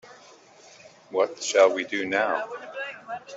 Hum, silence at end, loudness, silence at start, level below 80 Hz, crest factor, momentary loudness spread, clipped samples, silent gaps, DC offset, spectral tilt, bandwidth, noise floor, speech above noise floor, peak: none; 0 s; -25 LUFS; 0.05 s; -78 dBFS; 22 dB; 15 LU; under 0.1%; none; under 0.1%; -2 dB/octave; 8 kHz; -52 dBFS; 27 dB; -6 dBFS